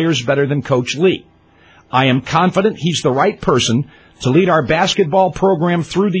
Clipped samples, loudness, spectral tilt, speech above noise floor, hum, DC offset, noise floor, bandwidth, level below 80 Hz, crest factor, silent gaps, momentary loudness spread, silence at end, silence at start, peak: under 0.1%; -15 LUFS; -5.5 dB/octave; 34 dB; none; under 0.1%; -48 dBFS; 8 kHz; -46 dBFS; 14 dB; none; 4 LU; 0 s; 0 s; 0 dBFS